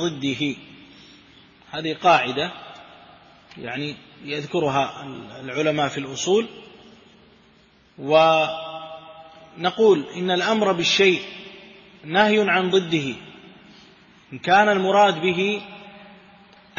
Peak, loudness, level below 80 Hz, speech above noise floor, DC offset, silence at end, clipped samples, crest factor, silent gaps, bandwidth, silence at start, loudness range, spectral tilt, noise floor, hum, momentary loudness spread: -2 dBFS; -21 LUFS; -64 dBFS; 35 dB; under 0.1%; 0.75 s; under 0.1%; 20 dB; none; 7.4 kHz; 0 s; 6 LU; -4.5 dB/octave; -55 dBFS; none; 20 LU